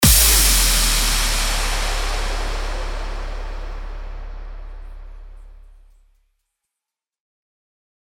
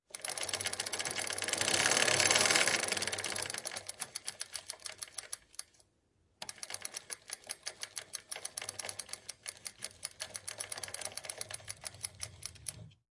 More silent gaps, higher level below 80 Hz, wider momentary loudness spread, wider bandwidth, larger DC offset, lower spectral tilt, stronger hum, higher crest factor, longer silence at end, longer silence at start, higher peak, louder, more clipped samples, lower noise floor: neither; first, -24 dBFS vs -74 dBFS; first, 25 LU vs 17 LU; first, over 20 kHz vs 11.5 kHz; neither; first, -1.5 dB/octave vs 0 dB/octave; neither; second, 20 dB vs 28 dB; first, 2.45 s vs 0.2 s; second, 0 s vs 0.15 s; first, -2 dBFS vs -10 dBFS; first, -17 LUFS vs -35 LUFS; neither; first, -86 dBFS vs -74 dBFS